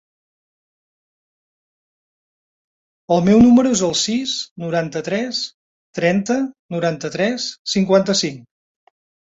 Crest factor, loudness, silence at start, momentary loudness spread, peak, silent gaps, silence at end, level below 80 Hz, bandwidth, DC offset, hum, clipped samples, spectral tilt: 18 dB; -18 LUFS; 3.1 s; 12 LU; -2 dBFS; 4.51-4.56 s, 5.54-5.93 s, 6.59-6.69 s, 7.59-7.65 s; 0.95 s; -52 dBFS; 8 kHz; under 0.1%; none; under 0.1%; -4.5 dB/octave